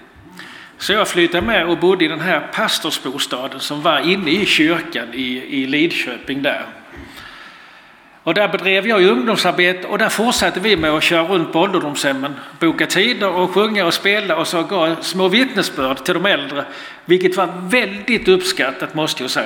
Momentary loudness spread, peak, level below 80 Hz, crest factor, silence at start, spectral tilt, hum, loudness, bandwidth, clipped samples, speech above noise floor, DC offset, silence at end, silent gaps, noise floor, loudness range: 10 LU; 0 dBFS; -50 dBFS; 16 dB; 0.25 s; -3.5 dB/octave; none; -16 LUFS; 18 kHz; under 0.1%; 28 dB; under 0.1%; 0 s; none; -45 dBFS; 4 LU